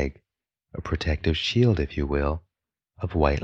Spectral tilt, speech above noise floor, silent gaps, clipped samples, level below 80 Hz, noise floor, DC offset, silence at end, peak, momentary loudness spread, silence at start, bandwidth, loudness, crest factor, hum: -6.5 dB/octave; 60 dB; none; under 0.1%; -34 dBFS; -84 dBFS; under 0.1%; 0 s; -6 dBFS; 14 LU; 0 s; 7.6 kHz; -26 LUFS; 20 dB; none